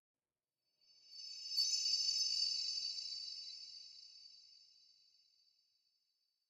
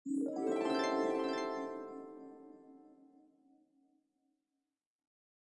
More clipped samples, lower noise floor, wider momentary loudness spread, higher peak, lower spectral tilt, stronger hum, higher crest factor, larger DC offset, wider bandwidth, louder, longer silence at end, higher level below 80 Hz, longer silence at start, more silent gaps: neither; about the same, under -90 dBFS vs under -90 dBFS; about the same, 22 LU vs 21 LU; about the same, -24 dBFS vs -24 dBFS; second, 5 dB/octave vs -4.5 dB/octave; neither; about the same, 20 dB vs 18 dB; neither; first, 16.5 kHz vs 11 kHz; about the same, -37 LUFS vs -37 LUFS; second, 1.85 s vs 2.6 s; about the same, under -90 dBFS vs under -90 dBFS; first, 1.05 s vs 0.05 s; neither